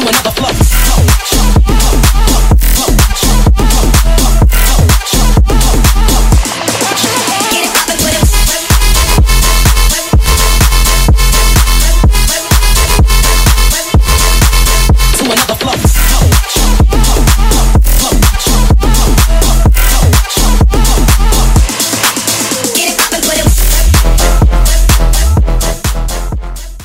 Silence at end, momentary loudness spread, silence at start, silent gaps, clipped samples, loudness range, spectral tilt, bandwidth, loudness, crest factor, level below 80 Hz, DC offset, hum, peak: 0 s; 2 LU; 0 s; none; under 0.1%; 1 LU; -3.5 dB/octave; 16.5 kHz; -9 LUFS; 8 dB; -8 dBFS; under 0.1%; none; 0 dBFS